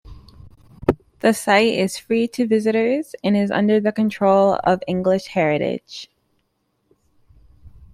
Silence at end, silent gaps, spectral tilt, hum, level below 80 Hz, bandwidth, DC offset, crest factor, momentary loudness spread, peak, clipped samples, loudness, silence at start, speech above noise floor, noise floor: 0.1 s; none; -5.5 dB/octave; none; -50 dBFS; 15 kHz; under 0.1%; 18 dB; 7 LU; -2 dBFS; under 0.1%; -19 LUFS; 0.05 s; 51 dB; -69 dBFS